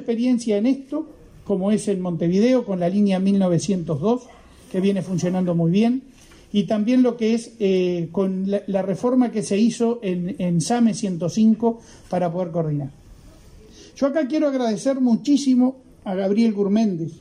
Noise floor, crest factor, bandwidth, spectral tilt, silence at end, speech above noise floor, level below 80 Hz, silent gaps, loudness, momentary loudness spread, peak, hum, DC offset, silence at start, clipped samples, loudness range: -46 dBFS; 14 dB; 11 kHz; -7 dB/octave; 0 s; 26 dB; -56 dBFS; none; -21 LUFS; 7 LU; -8 dBFS; none; under 0.1%; 0 s; under 0.1%; 3 LU